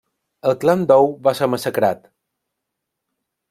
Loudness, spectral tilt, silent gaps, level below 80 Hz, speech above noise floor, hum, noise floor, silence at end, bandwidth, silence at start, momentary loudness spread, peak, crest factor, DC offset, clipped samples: -17 LUFS; -6 dB/octave; none; -64 dBFS; 63 dB; none; -79 dBFS; 1.55 s; 16 kHz; 0.45 s; 8 LU; -2 dBFS; 18 dB; under 0.1%; under 0.1%